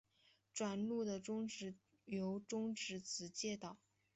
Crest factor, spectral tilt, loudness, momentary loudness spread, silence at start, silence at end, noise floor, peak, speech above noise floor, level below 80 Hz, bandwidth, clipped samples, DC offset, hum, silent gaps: 16 dB; -4 dB/octave; -45 LUFS; 10 LU; 0.55 s; 0.4 s; -76 dBFS; -30 dBFS; 32 dB; -82 dBFS; 8.2 kHz; under 0.1%; under 0.1%; none; none